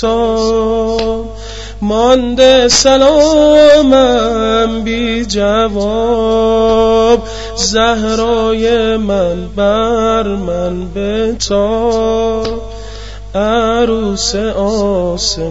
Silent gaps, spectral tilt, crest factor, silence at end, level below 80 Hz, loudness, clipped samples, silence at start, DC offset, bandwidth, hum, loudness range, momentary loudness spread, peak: none; -4 dB/octave; 12 dB; 0 s; -28 dBFS; -11 LUFS; under 0.1%; 0 s; 1%; 8 kHz; none; 6 LU; 11 LU; 0 dBFS